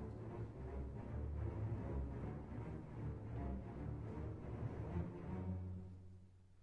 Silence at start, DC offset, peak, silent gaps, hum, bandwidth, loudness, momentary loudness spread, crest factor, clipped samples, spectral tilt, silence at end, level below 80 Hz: 0 s; under 0.1%; -32 dBFS; none; none; 6.4 kHz; -48 LUFS; 6 LU; 14 dB; under 0.1%; -10 dB/octave; 0 s; -54 dBFS